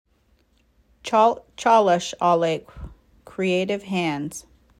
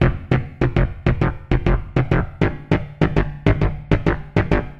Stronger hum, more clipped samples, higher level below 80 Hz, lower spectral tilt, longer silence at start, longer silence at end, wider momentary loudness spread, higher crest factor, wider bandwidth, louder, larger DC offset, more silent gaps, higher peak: neither; neither; second, -52 dBFS vs -26 dBFS; second, -5 dB/octave vs -9 dB/octave; first, 1.05 s vs 0 s; first, 0.4 s vs 0 s; first, 20 LU vs 3 LU; about the same, 18 dB vs 18 dB; first, 14.5 kHz vs 7 kHz; about the same, -21 LUFS vs -21 LUFS; neither; neither; second, -6 dBFS vs -2 dBFS